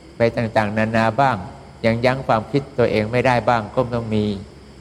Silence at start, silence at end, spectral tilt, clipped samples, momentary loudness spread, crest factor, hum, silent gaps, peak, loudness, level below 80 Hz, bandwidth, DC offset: 0.05 s; 0.05 s; -7 dB/octave; under 0.1%; 6 LU; 18 dB; none; none; -2 dBFS; -19 LUFS; -44 dBFS; 12 kHz; under 0.1%